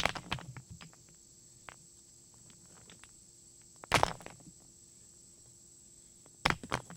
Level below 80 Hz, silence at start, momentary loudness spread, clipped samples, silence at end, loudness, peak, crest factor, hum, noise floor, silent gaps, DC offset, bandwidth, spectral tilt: -58 dBFS; 0 s; 23 LU; under 0.1%; 0 s; -34 LUFS; -8 dBFS; 34 dB; none; -59 dBFS; none; under 0.1%; 17.5 kHz; -3 dB/octave